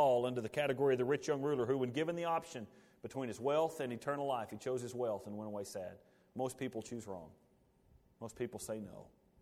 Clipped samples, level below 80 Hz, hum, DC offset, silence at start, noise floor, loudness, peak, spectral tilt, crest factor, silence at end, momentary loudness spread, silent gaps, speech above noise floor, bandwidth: under 0.1%; -74 dBFS; none; under 0.1%; 0 s; -70 dBFS; -38 LUFS; -20 dBFS; -5.5 dB/octave; 18 dB; 0.35 s; 16 LU; none; 31 dB; 16 kHz